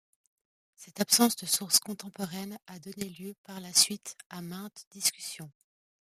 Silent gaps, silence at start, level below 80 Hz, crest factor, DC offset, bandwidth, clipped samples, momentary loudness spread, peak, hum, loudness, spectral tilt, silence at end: 3.38-3.44 s, 4.26-4.30 s, 4.87-4.91 s; 0.8 s; -78 dBFS; 26 dB; under 0.1%; 15.5 kHz; under 0.1%; 21 LU; -8 dBFS; none; -27 LUFS; -1.5 dB/octave; 0.5 s